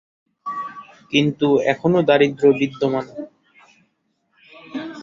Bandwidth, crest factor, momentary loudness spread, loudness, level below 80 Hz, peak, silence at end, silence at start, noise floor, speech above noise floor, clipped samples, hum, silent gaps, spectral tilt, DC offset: 7.4 kHz; 18 dB; 19 LU; -18 LUFS; -62 dBFS; -2 dBFS; 0 s; 0.45 s; -69 dBFS; 51 dB; under 0.1%; none; none; -6.5 dB/octave; under 0.1%